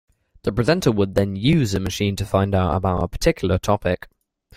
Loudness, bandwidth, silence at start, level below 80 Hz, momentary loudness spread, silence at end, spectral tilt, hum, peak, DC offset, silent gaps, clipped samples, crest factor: -21 LUFS; 16 kHz; 0.45 s; -38 dBFS; 5 LU; 0.6 s; -6 dB/octave; none; -2 dBFS; under 0.1%; none; under 0.1%; 18 dB